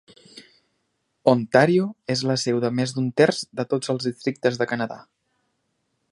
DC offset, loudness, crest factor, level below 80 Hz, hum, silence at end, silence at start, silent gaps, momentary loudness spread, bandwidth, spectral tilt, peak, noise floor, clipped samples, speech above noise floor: under 0.1%; -22 LUFS; 22 dB; -68 dBFS; none; 1.1 s; 0.35 s; none; 9 LU; 11.5 kHz; -5.5 dB/octave; -2 dBFS; -73 dBFS; under 0.1%; 51 dB